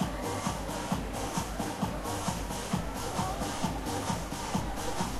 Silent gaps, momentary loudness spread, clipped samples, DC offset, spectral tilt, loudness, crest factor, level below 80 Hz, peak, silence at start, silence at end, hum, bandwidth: none; 2 LU; under 0.1%; under 0.1%; -4.5 dB/octave; -34 LUFS; 16 dB; -44 dBFS; -16 dBFS; 0 s; 0 s; none; 16 kHz